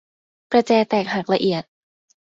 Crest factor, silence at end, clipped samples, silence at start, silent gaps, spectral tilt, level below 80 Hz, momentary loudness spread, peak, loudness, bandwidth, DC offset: 18 dB; 0.65 s; under 0.1%; 0.5 s; none; -6 dB/octave; -64 dBFS; 5 LU; -4 dBFS; -20 LUFS; 7.8 kHz; under 0.1%